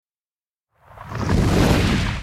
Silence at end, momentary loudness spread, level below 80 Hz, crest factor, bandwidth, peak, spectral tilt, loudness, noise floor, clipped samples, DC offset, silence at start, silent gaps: 0 s; 11 LU; -28 dBFS; 18 dB; 15.5 kHz; -2 dBFS; -6 dB/octave; -19 LUFS; under -90 dBFS; under 0.1%; under 0.1%; 0.95 s; none